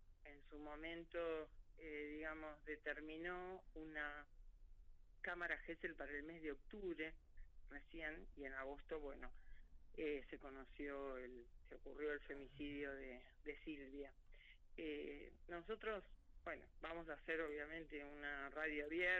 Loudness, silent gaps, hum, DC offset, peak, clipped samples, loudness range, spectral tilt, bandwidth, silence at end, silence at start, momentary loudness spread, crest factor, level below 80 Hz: -51 LUFS; none; none; under 0.1%; -28 dBFS; under 0.1%; 3 LU; -2.5 dB/octave; 7.6 kHz; 0 s; 0 s; 14 LU; 22 dB; -62 dBFS